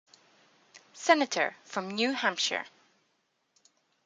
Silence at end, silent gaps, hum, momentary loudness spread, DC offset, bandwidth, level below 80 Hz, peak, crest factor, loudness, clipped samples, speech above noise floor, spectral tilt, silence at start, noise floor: 1.4 s; none; none; 11 LU; under 0.1%; 9.6 kHz; -86 dBFS; -8 dBFS; 26 dB; -29 LUFS; under 0.1%; 47 dB; -2 dB/octave; 0.75 s; -76 dBFS